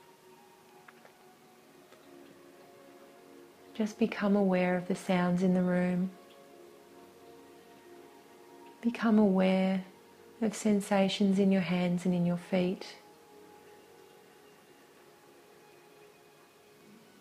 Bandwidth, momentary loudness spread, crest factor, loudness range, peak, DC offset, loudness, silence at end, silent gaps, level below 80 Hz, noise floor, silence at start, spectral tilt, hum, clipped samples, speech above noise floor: 13.5 kHz; 10 LU; 18 dB; 10 LU; -14 dBFS; under 0.1%; -30 LUFS; 4.25 s; none; -72 dBFS; -59 dBFS; 3.75 s; -7 dB/octave; none; under 0.1%; 31 dB